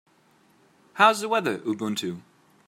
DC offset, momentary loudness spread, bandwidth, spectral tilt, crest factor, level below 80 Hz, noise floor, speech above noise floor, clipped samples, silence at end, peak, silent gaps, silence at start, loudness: under 0.1%; 19 LU; 16 kHz; -4 dB/octave; 22 dB; -80 dBFS; -61 dBFS; 37 dB; under 0.1%; 0.45 s; -4 dBFS; none; 0.95 s; -24 LUFS